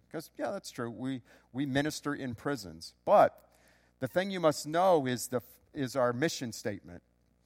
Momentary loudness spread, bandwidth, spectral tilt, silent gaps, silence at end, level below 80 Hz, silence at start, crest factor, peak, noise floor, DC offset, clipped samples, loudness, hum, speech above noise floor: 14 LU; 16.5 kHz; -5 dB/octave; none; 0.45 s; -68 dBFS; 0.15 s; 22 dB; -10 dBFS; -65 dBFS; under 0.1%; under 0.1%; -32 LUFS; none; 34 dB